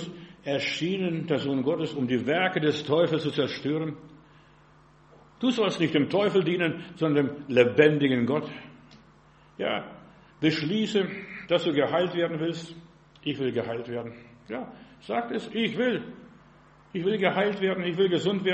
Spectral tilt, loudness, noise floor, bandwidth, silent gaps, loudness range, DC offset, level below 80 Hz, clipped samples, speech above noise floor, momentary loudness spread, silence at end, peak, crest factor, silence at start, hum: -6.5 dB/octave; -27 LUFS; -56 dBFS; 8.4 kHz; none; 7 LU; under 0.1%; -66 dBFS; under 0.1%; 30 dB; 14 LU; 0 s; -6 dBFS; 22 dB; 0 s; none